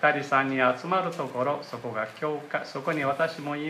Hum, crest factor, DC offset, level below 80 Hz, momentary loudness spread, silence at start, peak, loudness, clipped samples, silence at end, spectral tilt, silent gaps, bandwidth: none; 20 dB; under 0.1%; -76 dBFS; 9 LU; 0 s; -8 dBFS; -28 LUFS; under 0.1%; 0 s; -5.5 dB/octave; none; 15 kHz